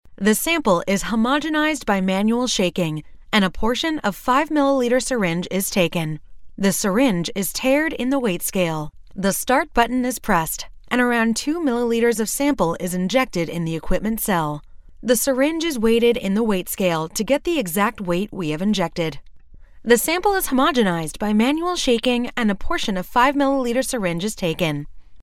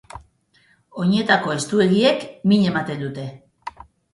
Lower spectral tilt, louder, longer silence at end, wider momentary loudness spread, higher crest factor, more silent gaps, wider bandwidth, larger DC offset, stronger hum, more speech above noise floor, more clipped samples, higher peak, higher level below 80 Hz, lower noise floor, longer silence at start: about the same, -4.5 dB/octave vs -5.5 dB/octave; about the same, -20 LUFS vs -19 LUFS; second, 0 s vs 0.45 s; second, 6 LU vs 21 LU; about the same, 18 dB vs 20 dB; neither; first, 16.5 kHz vs 11.5 kHz; neither; neither; second, 22 dB vs 40 dB; neither; about the same, -2 dBFS vs 0 dBFS; first, -40 dBFS vs -56 dBFS; second, -42 dBFS vs -59 dBFS; about the same, 0.1 s vs 0.15 s